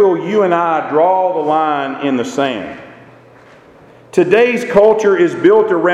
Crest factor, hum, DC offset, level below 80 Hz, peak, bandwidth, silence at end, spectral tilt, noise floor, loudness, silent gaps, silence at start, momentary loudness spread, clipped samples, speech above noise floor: 14 dB; none; under 0.1%; -54 dBFS; 0 dBFS; 11 kHz; 0 s; -6 dB/octave; -42 dBFS; -13 LUFS; none; 0 s; 8 LU; under 0.1%; 30 dB